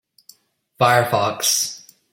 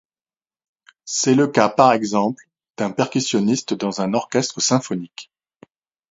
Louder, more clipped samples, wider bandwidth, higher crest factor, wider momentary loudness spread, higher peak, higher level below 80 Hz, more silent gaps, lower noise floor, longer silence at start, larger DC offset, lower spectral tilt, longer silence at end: about the same, -18 LUFS vs -19 LUFS; neither; first, 16.5 kHz vs 8 kHz; about the same, 18 dB vs 20 dB; second, 9 LU vs 13 LU; about the same, -2 dBFS vs 0 dBFS; about the same, -64 dBFS vs -64 dBFS; second, none vs 2.70-2.74 s; second, -58 dBFS vs under -90 dBFS; second, 0.8 s vs 1.05 s; neither; second, -2.5 dB/octave vs -4 dB/octave; second, 0.35 s vs 0.85 s